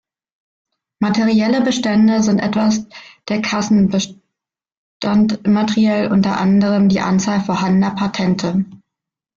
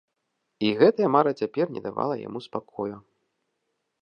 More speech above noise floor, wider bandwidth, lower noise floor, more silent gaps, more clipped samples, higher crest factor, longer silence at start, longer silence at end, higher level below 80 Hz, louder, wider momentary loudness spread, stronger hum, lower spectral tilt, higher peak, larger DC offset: first, 69 dB vs 54 dB; about the same, 7.4 kHz vs 6.8 kHz; first, -84 dBFS vs -78 dBFS; first, 4.77-5.00 s vs none; neither; second, 12 dB vs 22 dB; first, 1 s vs 0.6 s; second, 0.6 s vs 1 s; first, -52 dBFS vs -70 dBFS; first, -16 LUFS vs -25 LUFS; second, 8 LU vs 14 LU; neither; second, -6 dB/octave vs -7.5 dB/octave; about the same, -4 dBFS vs -6 dBFS; neither